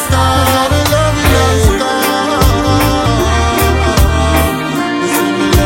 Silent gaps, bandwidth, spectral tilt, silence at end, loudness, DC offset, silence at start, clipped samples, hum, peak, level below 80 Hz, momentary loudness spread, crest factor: none; 17 kHz; -5 dB/octave; 0 s; -11 LUFS; under 0.1%; 0 s; under 0.1%; none; 0 dBFS; -18 dBFS; 3 LU; 10 dB